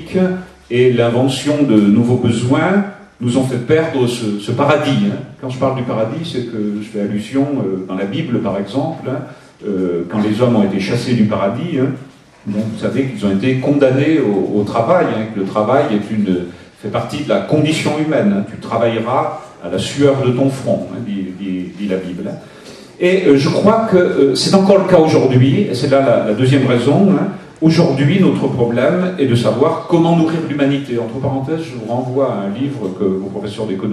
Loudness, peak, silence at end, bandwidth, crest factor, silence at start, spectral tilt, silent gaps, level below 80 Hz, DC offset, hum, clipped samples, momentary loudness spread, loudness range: -15 LUFS; 0 dBFS; 0 s; 12.5 kHz; 14 dB; 0 s; -7 dB/octave; none; -52 dBFS; under 0.1%; none; under 0.1%; 11 LU; 7 LU